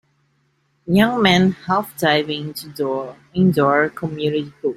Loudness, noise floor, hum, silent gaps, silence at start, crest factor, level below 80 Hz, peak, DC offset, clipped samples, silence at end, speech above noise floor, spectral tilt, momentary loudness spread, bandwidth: -18 LUFS; -64 dBFS; none; none; 0.85 s; 18 dB; -54 dBFS; -2 dBFS; under 0.1%; under 0.1%; 0 s; 46 dB; -6 dB/octave; 12 LU; 16 kHz